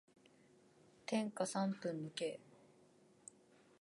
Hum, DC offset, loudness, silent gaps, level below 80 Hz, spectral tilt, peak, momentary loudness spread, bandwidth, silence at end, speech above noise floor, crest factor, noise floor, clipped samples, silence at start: none; under 0.1%; -42 LUFS; none; under -90 dBFS; -5 dB/octave; -24 dBFS; 20 LU; 11.5 kHz; 1.45 s; 28 dB; 20 dB; -69 dBFS; under 0.1%; 1.1 s